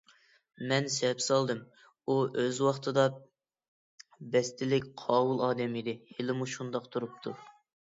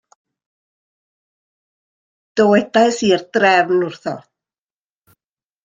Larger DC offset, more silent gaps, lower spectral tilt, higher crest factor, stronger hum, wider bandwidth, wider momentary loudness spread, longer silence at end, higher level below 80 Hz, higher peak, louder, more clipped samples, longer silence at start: neither; first, 3.68-3.98 s vs none; about the same, -4.5 dB/octave vs -4.5 dB/octave; about the same, 20 dB vs 18 dB; neither; second, 7.8 kHz vs 9.4 kHz; about the same, 13 LU vs 14 LU; second, 0.4 s vs 1.45 s; second, -74 dBFS vs -64 dBFS; second, -12 dBFS vs -2 dBFS; second, -31 LUFS vs -15 LUFS; neither; second, 0.6 s vs 2.35 s